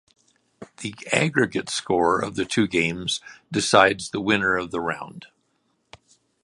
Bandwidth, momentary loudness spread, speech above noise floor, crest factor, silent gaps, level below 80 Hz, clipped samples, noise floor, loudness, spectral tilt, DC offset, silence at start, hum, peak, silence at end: 11.5 kHz; 14 LU; 47 dB; 24 dB; none; -56 dBFS; under 0.1%; -70 dBFS; -22 LUFS; -4 dB/octave; under 0.1%; 0.6 s; none; 0 dBFS; 1.2 s